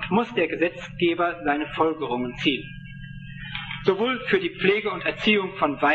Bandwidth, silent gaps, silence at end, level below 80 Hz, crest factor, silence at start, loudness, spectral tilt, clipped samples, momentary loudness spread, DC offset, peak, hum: 7.8 kHz; none; 0 s; -50 dBFS; 18 dB; 0 s; -24 LUFS; -6.5 dB/octave; under 0.1%; 14 LU; under 0.1%; -6 dBFS; none